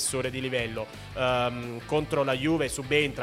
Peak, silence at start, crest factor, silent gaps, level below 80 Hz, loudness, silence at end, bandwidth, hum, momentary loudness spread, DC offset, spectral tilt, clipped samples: -8 dBFS; 0 s; 20 dB; none; -50 dBFS; -28 LUFS; 0 s; 16.5 kHz; none; 8 LU; under 0.1%; -4 dB/octave; under 0.1%